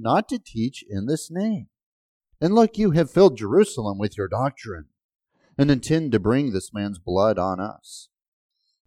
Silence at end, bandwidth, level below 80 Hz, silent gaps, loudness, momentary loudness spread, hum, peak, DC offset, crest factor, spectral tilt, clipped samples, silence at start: 0.85 s; 13.5 kHz; -50 dBFS; 1.83-2.20 s, 5.04-5.09 s; -22 LUFS; 15 LU; none; -4 dBFS; under 0.1%; 18 dB; -6.5 dB/octave; under 0.1%; 0 s